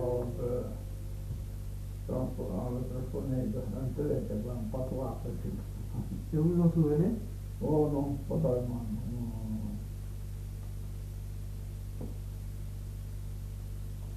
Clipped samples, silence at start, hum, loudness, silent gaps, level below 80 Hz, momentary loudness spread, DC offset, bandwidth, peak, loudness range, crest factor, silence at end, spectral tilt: under 0.1%; 0 s; 50 Hz at -45 dBFS; -35 LUFS; none; -42 dBFS; 13 LU; under 0.1%; 14 kHz; -16 dBFS; 11 LU; 18 dB; 0 s; -9 dB/octave